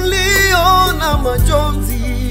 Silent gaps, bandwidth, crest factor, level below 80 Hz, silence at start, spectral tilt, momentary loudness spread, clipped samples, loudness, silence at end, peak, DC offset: none; 16.5 kHz; 12 dB; -18 dBFS; 0 s; -4 dB/octave; 9 LU; under 0.1%; -13 LUFS; 0 s; 0 dBFS; under 0.1%